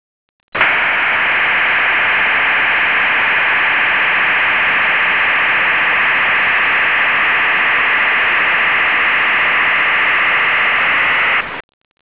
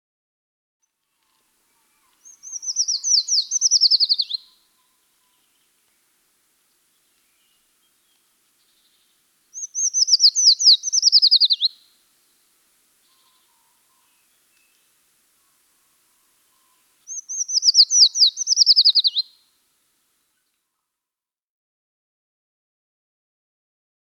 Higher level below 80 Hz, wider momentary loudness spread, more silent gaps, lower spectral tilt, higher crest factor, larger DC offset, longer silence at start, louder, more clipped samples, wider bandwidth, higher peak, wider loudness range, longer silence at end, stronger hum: first, -50 dBFS vs -90 dBFS; second, 1 LU vs 18 LU; neither; first, -4.5 dB/octave vs 8 dB/octave; second, 14 dB vs 20 dB; first, 0.7% vs under 0.1%; second, 0.55 s vs 2.45 s; first, -11 LUFS vs -14 LUFS; neither; second, 4 kHz vs 18 kHz; about the same, 0 dBFS vs -2 dBFS; second, 0 LU vs 13 LU; second, 0.55 s vs 4.8 s; neither